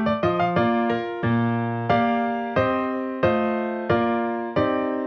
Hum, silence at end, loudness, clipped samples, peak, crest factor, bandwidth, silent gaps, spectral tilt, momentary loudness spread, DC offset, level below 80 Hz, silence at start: none; 0 s; -23 LUFS; under 0.1%; -6 dBFS; 18 dB; 6.2 kHz; none; -9 dB/octave; 4 LU; under 0.1%; -52 dBFS; 0 s